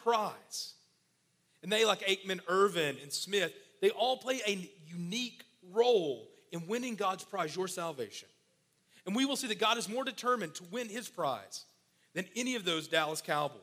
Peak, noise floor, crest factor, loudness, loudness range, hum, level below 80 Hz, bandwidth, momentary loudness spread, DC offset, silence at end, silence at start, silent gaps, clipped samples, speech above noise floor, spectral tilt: -14 dBFS; -75 dBFS; 20 dB; -34 LUFS; 4 LU; none; -86 dBFS; 16 kHz; 14 LU; under 0.1%; 0 s; 0 s; none; under 0.1%; 41 dB; -3 dB/octave